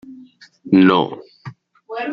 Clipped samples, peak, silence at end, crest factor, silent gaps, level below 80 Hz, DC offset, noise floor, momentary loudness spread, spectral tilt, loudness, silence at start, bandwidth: under 0.1%; -2 dBFS; 0 s; 18 dB; none; -62 dBFS; under 0.1%; -45 dBFS; 26 LU; -8.5 dB/octave; -15 LUFS; 0.05 s; 5.8 kHz